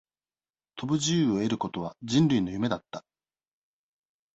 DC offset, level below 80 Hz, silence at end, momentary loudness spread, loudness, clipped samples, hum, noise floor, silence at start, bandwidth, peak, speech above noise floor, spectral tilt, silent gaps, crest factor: under 0.1%; -62 dBFS; 1.35 s; 17 LU; -27 LUFS; under 0.1%; none; under -90 dBFS; 0.75 s; 8.2 kHz; -12 dBFS; over 63 dB; -5.5 dB/octave; none; 18 dB